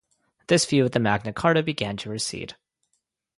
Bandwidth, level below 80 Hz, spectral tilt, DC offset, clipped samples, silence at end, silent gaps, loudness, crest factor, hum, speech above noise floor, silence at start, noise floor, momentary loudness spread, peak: 11.5 kHz; -56 dBFS; -4.5 dB/octave; under 0.1%; under 0.1%; 0.85 s; none; -23 LUFS; 20 dB; none; 53 dB; 0.5 s; -76 dBFS; 9 LU; -6 dBFS